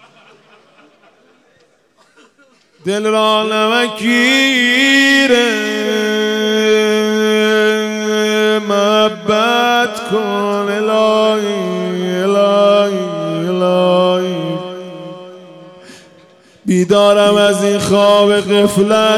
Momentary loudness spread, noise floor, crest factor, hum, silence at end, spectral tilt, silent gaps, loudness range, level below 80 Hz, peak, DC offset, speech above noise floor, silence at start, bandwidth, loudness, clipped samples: 9 LU; -53 dBFS; 14 dB; none; 0 s; -4 dB/octave; none; 6 LU; -56 dBFS; 0 dBFS; under 0.1%; 42 dB; 2.85 s; 16 kHz; -12 LUFS; under 0.1%